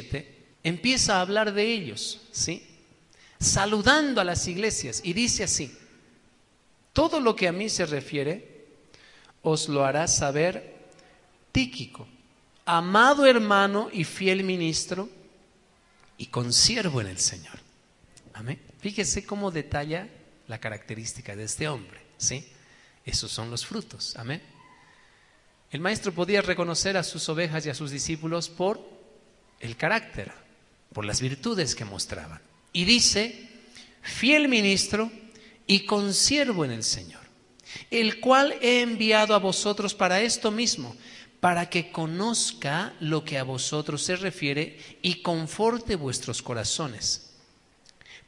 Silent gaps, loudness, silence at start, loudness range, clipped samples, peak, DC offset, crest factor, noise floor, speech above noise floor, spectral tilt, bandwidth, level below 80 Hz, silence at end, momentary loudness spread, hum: none; -25 LUFS; 0 s; 9 LU; under 0.1%; -4 dBFS; under 0.1%; 24 dB; -62 dBFS; 36 dB; -3 dB/octave; 11.5 kHz; -52 dBFS; 0.1 s; 16 LU; none